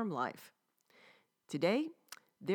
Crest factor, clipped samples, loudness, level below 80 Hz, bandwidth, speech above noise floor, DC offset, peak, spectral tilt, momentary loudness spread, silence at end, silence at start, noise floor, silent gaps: 20 dB; under 0.1%; -37 LUFS; under -90 dBFS; 20 kHz; 31 dB; under 0.1%; -18 dBFS; -6 dB/octave; 21 LU; 0 s; 0 s; -68 dBFS; none